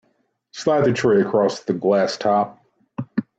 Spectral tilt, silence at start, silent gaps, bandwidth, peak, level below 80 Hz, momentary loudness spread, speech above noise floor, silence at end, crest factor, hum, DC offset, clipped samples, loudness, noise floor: -6 dB/octave; 0.55 s; none; 8.2 kHz; -6 dBFS; -62 dBFS; 13 LU; 48 dB; 0.15 s; 16 dB; none; under 0.1%; under 0.1%; -20 LUFS; -67 dBFS